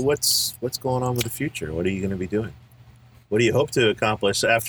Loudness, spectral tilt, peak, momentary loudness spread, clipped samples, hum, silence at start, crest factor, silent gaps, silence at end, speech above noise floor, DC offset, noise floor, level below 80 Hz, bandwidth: -23 LUFS; -4 dB/octave; -6 dBFS; 8 LU; under 0.1%; none; 0 s; 18 dB; none; 0 s; 28 dB; under 0.1%; -50 dBFS; -50 dBFS; over 20 kHz